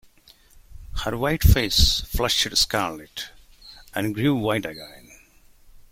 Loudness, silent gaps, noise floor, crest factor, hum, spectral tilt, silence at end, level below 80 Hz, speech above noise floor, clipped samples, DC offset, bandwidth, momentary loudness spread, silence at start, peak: -22 LUFS; none; -54 dBFS; 20 dB; none; -4 dB/octave; 0.1 s; -30 dBFS; 32 dB; under 0.1%; under 0.1%; 16.5 kHz; 17 LU; 0.7 s; -4 dBFS